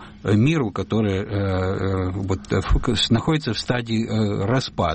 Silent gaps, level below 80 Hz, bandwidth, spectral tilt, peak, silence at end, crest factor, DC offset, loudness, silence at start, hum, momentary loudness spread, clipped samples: none; -32 dBFS; 8.8 kHz; -6 dB/octave; -8 dBFS; 0 s; 14 dB; under 0.1%; -22 LUFS; 0 s; none; 5 LU; under 0.1%